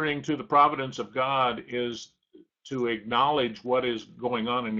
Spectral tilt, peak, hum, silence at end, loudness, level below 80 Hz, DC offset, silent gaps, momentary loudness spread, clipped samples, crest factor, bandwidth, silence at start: -5 dB/octave; -8 dBFS; none; 0 s; -27 LUFS; -64 dBFS; under 0.1%; none; 11 LU; under 0.1%; 20 dB; 7.6 kHz; 0 s